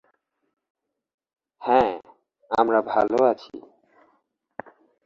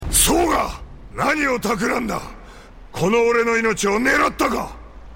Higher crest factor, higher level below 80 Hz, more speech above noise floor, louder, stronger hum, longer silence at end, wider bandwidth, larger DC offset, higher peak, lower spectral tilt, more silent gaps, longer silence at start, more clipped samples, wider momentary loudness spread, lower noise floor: about the same, 22 dB vs 18 dB; second, -64 dBFS vs -36 dBFS; first, 48 dB vs 21 dB; second, -22 LUFS vs -19 LUFS; neither; first, 1.45 s vs 0 s; second, 7.4 kHz vs 16.5 kHz; neither; about the same, -4 dBFS vs -4 dBFS; first, -6.5 dB/octave vs -3 dB/octave; neither; first, 1.6 s vs 0 s; neither; first, 22 LU vs 16 LU; first, -69 dBFS vs -40 dBFS